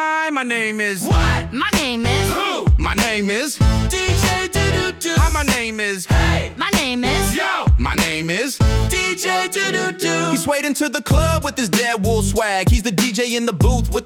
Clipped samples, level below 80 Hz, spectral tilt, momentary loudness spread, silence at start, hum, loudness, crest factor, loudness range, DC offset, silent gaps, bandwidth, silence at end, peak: under 0.1%; -24 dBFS; -4.5 dB/octave; 3 LU; 0 s; none; -18 LUFS; 14 dB; 1 LU; under 0.1%; none; 18 kHz; 0 s; -4 dBFS